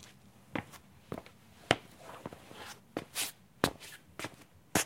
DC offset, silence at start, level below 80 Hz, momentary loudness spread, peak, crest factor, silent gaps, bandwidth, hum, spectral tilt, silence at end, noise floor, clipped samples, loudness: under 0.1%; 0 s; -64 dBFS; 21 LU; -6 dBFS; 34 dB; none; 16.5 kHz; none; -3 dB/octave; 0 s; -58 dBFS; under 0.1%; -39 LUFS